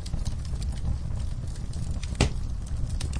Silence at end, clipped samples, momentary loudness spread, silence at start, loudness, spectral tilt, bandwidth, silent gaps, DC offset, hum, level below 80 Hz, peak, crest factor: 0 s; under 0.1%; 7 LU; 0 s; -32 LUFS; -5.5 dB/octave; 10.5 kHz; none; under 0.1%; none; -30 dBFS; -8 dBFS; 22 dB